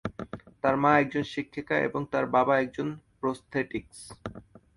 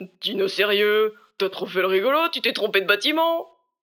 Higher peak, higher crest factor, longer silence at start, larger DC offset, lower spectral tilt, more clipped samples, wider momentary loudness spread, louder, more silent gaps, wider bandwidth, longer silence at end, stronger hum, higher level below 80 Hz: second, -8 dBFS vs -4 dBFS; about the same, 20 dB vs 18 dB; about the same, 0.05 s vs 0 s; neither; first, -6.5 dB/octave vs -3.5 dB/octave; neither; first, 19 LU vs 8 LU; second, -28 LUFS vs -21 LUFS; neither; second, 11.5 kHz vs 19.5 kHz; about the same, 0.35 s vs 0.35 s; neither; first, -58 dBFS vs -82 dBFS